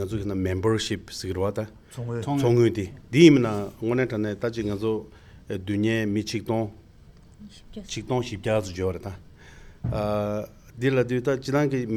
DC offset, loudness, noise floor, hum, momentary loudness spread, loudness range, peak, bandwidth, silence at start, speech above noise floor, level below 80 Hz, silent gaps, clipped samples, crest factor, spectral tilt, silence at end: under 0.1%; -25 LUFS; -50 dBFS; none; 14 LU; 8 LU; -2 dBFS; 14 kHz; 0 s; 26 dB; -50 dBFS; none; under 0.1%; 22 dB; -6.5 dB/octave; 0 s